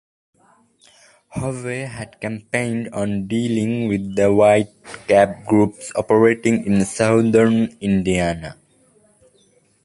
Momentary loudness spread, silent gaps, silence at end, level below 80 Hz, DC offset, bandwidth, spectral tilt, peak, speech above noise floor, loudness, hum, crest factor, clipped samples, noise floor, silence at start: 14 LU; none; 1.3 s; -48 dBFS; under 0.1%; 11.5 kHz; -6.5 dB/octave; -2 dBFS; 40 dB; -18 LUFS; none; 18 dB; under 0.1%; -58 dBFS; 1.35 s